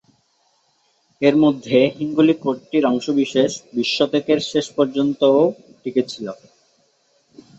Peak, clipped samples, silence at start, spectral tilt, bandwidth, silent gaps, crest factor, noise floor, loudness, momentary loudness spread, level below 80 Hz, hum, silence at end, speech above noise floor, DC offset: -2 dBFS; under 0.1%; 1.2 s; -5.5 dB/octave; 8 kHz; none; 18 dB; -63 dBFS; -18 LUFS; 8 LU; -64 dBFS; none; 1.25 s; 45 dB; under 0.1%